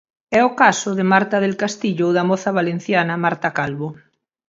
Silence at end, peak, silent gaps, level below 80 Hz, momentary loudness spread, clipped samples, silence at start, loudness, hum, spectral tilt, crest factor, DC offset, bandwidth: 0.55 s; 0 dBFS; none; -62 dBFS; 7 LU; under 0.1%; 0.3 s; -18 LUFS; none; -5 dB/octave; 18 dB; under 0.1%; 7.8 kHz